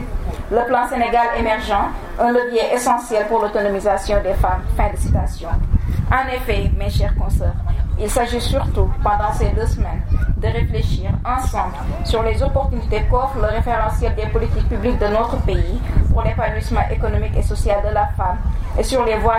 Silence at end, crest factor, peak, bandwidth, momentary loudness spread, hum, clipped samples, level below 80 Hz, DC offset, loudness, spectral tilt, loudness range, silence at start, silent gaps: 0 s; 16 dB; -2 dBFS; 16 kHz; 4 LU; none; under 0.1%; -20 dBFS; under 0.1%; -19 LUFS; -6 dB/octave; 2 LU; 0 s; none